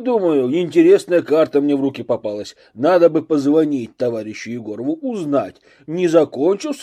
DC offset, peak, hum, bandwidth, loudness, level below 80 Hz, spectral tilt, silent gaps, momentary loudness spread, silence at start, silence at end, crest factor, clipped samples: under 0.1%; -2 dBFS; none; 11.5 kHz; -17 LUFS; -66 dBFS; -6.5 dB/octave; none; 14 LU; 0 s; 0 s; 16 dB; under 0.1%